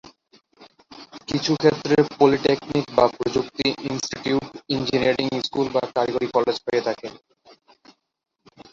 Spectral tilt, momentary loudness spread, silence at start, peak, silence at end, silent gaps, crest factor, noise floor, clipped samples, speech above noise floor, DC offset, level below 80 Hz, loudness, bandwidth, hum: -5 dB/octave; 10 LU; 0.6 s; -2 dBFS; 1.55 s; none; 20 dB; -58 dBFS; under 0.1%; 36 dB; under 0.1%; -56 dBFS; -22 LUFS; 7.6 kHz; none